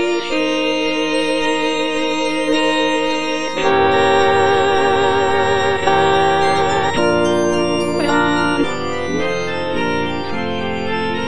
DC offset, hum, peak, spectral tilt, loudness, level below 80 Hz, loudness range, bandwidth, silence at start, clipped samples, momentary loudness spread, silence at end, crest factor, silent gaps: 4%; none; -2 dBFS; -4.5 dB/octave; -16 LUFS; -44 dBFS; 4 LU; 10 kHz; 0 s; under 0.1%; 7 LU; 0 s; 16 dB; none